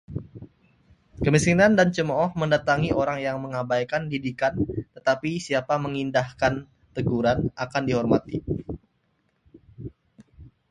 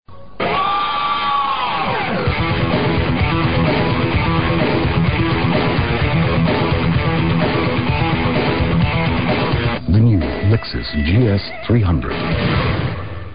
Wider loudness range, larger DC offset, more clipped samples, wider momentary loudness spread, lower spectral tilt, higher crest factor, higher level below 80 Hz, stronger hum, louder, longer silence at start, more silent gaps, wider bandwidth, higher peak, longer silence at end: first, 5 LU vs 1 LU; second, under 0.1% vs 2%; neither; first, 17 LU vs 3 LU; second, -6 dB/octave vs -12 dB/octave; first, 20 dB vs 14 dB; second, -48 dBFS vs -28 dBFS; neither; second, -24 LUFS vs -17 LUFS; about the same, 0.1 s vs 0 s; neither; first, 11.5 kHz vs 5.2 kHz; about the same, -4 dBFS vs -4 dBFS; first, 0.25 s vs 0 s